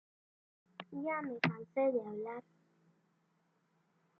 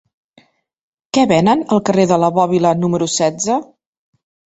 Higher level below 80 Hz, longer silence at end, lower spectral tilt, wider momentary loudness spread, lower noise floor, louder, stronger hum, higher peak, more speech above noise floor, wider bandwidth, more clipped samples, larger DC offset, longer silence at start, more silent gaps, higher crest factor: second, -82 dBFS vs -54 dBFS; first, 1.8 s vs 0.95 s; about the same, -4.5 dB/octave vs -5 dB/octave; first, 16 LU vs 6 LU; first, -77 dBFS vs -54 dBFS; second, -38 LUFS vs -15 LUFS; neither; second, -16 dBFS vs -2 dBFS; about the same, 40 dB vs 40 dB; second, 6.6 kHz vs 8.2 kHz; neither; neither; second, 0.8 s vs 1.15 s; neither; first, 26 dB vs 16 dB